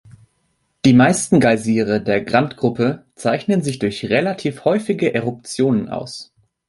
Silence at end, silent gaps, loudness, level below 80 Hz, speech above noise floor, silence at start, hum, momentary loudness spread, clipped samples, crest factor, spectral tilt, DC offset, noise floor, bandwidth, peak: 0.45 s; none; -18 LUFS; -52 dBFS; 50 dB; 0.85 s; none; 10 LU; under 0.1%; 16 dB; -5.5 dB/octave; under 0.1%; -67 dBFS; 11.5 kHz; -2 dBFS